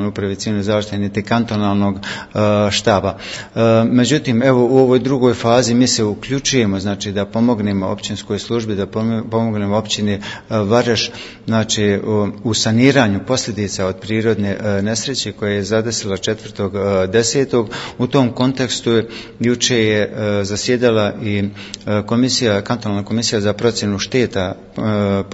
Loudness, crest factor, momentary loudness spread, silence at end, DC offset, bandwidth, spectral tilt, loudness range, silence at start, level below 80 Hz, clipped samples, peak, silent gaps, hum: -17 LUFS; 16 dB; 8 LU; 0 s; under 0.1%; 8 kHz; -5 dB/octave; 5 LU; 0 s; -48 dBFS; under 0.1%; 0 dBFS; none; none